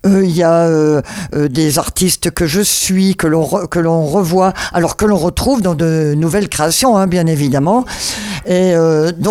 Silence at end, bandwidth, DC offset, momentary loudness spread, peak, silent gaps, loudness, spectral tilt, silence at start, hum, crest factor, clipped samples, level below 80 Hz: 0 s; 16.5 kHz; under 0.1%; 5 LU; 0 dBFS; none; -13 LUFS; -5 dB/octave; 0.05 s; none; 12 dB; under 0.1%; -34 dBFS